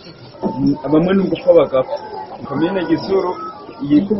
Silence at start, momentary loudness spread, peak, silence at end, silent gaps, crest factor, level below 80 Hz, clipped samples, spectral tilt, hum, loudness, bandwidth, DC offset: 0 s; 16 LU; 0 dBFS; 0 s; none; 16 dB; -48 dBFS; under 0.1%; -6.5 dB/octave; none; -17 LUFS; 6 kHz; under 0.1%